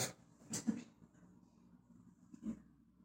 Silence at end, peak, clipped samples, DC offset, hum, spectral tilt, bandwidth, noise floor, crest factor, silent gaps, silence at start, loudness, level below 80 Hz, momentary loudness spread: 0 s; -24 dBFS; under 0.1%; under 0.1%; none; -3.5 dB/octave; 16 kHz; -66 dBFS; 24 dB; none; 0 s; -45 LUFS; -76 dBFS; 25 LU